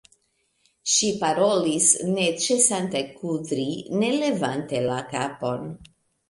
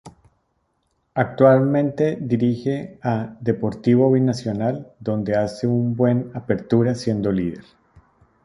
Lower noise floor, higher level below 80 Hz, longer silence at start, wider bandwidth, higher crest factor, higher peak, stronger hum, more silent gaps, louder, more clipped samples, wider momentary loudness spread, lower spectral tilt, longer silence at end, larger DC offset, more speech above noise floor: about the same, -70 dBFS vs -69 dBFS; second, -64 dBFS vs -54 dBFS; first, 0.85 s vs 0.05 s; about the same, 11.5 kHz vs 11 kHz; about the same, 20 dB vs 18 dB; about the same, -4 dBFS vs -2 dBFS; neither; neither; about the same, -23 LUFS vs -21 LUFS; neither; about the same, 11 LU vs 10 LU; second, -3 dB/octave vs -8.5 dB/octave; second, 0.45 s vs 0.85 s; neither; second, 46 dB vs 50 dB